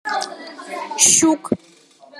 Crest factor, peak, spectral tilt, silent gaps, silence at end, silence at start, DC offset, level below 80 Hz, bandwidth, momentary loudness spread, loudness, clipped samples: 20 dB; 0 dBFS; -1.5 dB/octave; none; 0 s; 0.05 s; under 0.1%; -68 dBFS; 14 kHz; 19 LU; -15 LUFS; under 0.1%